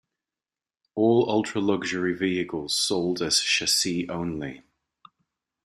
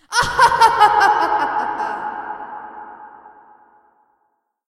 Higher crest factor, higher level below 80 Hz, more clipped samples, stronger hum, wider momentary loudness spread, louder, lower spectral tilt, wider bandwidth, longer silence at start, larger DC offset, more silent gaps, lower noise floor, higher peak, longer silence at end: about the same, 18 dB vs 18 dB; second, -62 dBFS vs -48 dBFS; neither; neither; second, 10 LU vs 22 LU; second, -24 LUFS vs -15 LUFS; about the same, -3 dB/octave vs -2 dB/octave; about the same, 15.5 kHz vs 14.5 kHz; first, 0.95 s vs 0.1 s; neither; neither; first, under -90 dBFS vs -68 dBFS; second, -8 dBFS vs 0 dBFS; second, 1.05 s vs 1.4 s